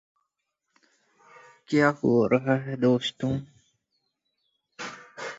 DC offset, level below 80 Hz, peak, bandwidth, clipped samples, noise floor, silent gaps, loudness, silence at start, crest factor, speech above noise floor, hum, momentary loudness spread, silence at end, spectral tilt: under 0.1%; -62 dBFS; -6 dBFS; 7.8 kHz; under 0.1%; -81 dBFS; none; -25 LUFS; 1.7 s; 22 dB; 57 dB; none; 17 LU; 0 s; -6.5 dB/octave